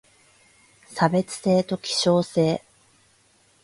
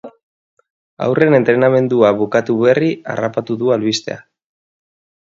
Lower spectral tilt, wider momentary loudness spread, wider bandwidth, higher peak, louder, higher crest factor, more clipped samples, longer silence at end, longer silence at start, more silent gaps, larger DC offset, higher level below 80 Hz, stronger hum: about the same, -5 dB/octave vs -6 dB/octave; second, 5 LU vs 9 LU; first, 11.5 kHz vs 7.8 kHz; second, -6 dBFS vs 0 dBFS; second, -23 LUFS vs -15 LUFS; about the same, 20 dB vs 16 dB; neither; about the same, 1.05 s vs 1 s; first, 0.9 s vs 0.05 s; second, none vs 0.23-0.57 s, 0.70-0.97 s; neither; about the same, -64 dBFS vs -60 dBFS; neither